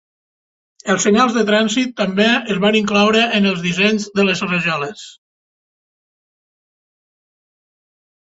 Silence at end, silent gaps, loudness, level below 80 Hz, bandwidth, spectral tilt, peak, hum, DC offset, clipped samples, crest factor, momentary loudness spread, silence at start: 3.25 s; none; -15 LUFS; -58 dBFS; 8 kHz; -4 dB/octave; -2 dBFS; none; under 0.1%; under 0.1%; 18 dB; 7 LU; 0.85 s